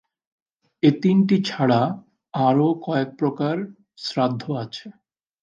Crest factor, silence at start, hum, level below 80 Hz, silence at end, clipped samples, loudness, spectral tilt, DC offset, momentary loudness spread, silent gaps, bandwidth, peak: 18 dB; 0.85 s; none; -68 dBFS; 0.5 s; under 0.1%; -22 LUFS; -7.5 dB/octave; under 0.1%; 14 LU; none; 7.6 kHz; -4 dBFS